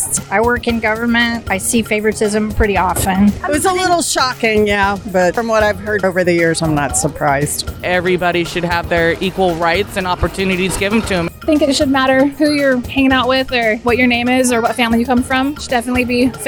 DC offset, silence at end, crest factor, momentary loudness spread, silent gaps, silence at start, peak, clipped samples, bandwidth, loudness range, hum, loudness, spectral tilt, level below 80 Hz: under 0.1%; 0 s; 14 dB; 4 LU; none; 0 s; 0 dBFS; under 0.1%; 19.5 kHz; 2 LU; none; -14 LUFS; -4 dB/octave; -32 dBFS